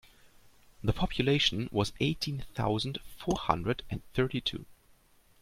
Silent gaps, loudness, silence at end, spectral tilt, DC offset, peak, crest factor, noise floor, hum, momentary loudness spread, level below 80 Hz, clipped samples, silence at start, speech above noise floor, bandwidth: none; -31 LUFS; 0.65 s; -5.5 dB/octave; under 0.1%; -8 dBFS; 24 dB; -63 dBFS; none; 9 LU; -48 dBFS; under 0.1%; 0.25 s; 32 dB; 16 kHz